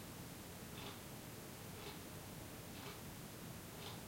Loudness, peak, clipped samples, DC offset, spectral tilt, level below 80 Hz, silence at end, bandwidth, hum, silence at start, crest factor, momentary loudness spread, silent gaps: -51 LUFS; -38 dBFS; under 0.1%; under 0.1%; -4 dB/octave; -68 dBFS; 0 s; 16.5 kHz; none; 0 s; 14 dB; 2 LU; none